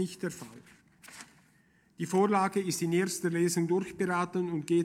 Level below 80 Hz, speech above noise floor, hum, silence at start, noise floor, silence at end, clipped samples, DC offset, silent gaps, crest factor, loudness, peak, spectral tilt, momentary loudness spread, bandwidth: -72 dBFS; 36 dB; none; 0 s; -66 dBFS; 0 s; under 0.1%; under 0.1%; none; 18 dB; -30 LUFS; -14 dBFS; -5.5 dB/octave; 22 LU; 16 kHz